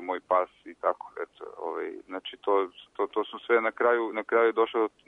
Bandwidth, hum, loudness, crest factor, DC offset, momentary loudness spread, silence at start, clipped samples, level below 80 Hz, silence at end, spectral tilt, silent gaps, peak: 3.9 kHz; none; -28 LUFS; 16 dB; under 0.1%; 14 LU; 0 s; under 0.1%; -76 dBFS; 0.2 s; -5.5 dB/octave; none; -12 dBFS